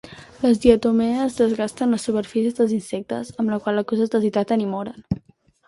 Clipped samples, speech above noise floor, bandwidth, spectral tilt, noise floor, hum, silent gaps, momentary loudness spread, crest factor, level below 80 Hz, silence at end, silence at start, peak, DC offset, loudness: under 0.1%; 32 dB; 11.5 kHz; -6.5 dB/octave; -52 dBFS; none; none; 12 LU; 20 dB; -48 dBFS; 0.5 s; 0.05 s; -2 dBFS; under 0.1%; -21 LUFS